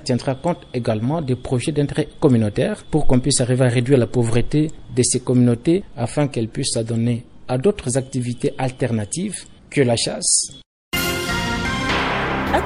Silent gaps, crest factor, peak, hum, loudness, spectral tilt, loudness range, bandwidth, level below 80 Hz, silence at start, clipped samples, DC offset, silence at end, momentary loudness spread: 10.66-10.91 s; 18 dB; -2 dBFS; none; -20 LUFS; -5 dB/octave; 4 LU; 15.5 kHz; -34 dBFS; 0 s; under 0.1%; under 0.1%; 0 s; 7 LU